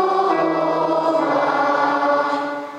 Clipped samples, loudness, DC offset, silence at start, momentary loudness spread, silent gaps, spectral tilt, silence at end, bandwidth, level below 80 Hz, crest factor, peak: under 0.1%; -18 LUFS; under 0.1%; 0 s; 2 LU; none; -5.5 dB/octave; 0 s; 11 kHz; -74 dBFS; 12 dB; -6 dBFS